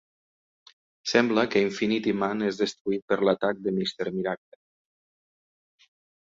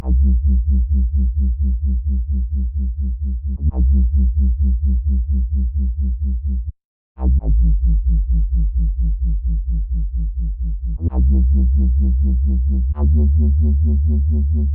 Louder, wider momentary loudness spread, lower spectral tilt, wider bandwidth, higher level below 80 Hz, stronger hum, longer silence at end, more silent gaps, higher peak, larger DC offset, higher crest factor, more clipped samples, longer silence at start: second, -26 LUFS vs -19 LUFS; about the same, 8 LU vs 7 LU; second, -5 dB/octave vs -16.5 dB/octave; first, 7.8 kHz vs 1.1 kHz; second, -66 dBFS vs -16 dBFS; neither; first, 1.85 s vs 0 s; second, 2.81-2.85 s, 3.02-3.08 s vs 6.85-7.15 s; about the same, -6 dBFS vs -8 dBFS; neither; first, 22 dB vs 8 dB; neither; first, 1.05 s vs 0 s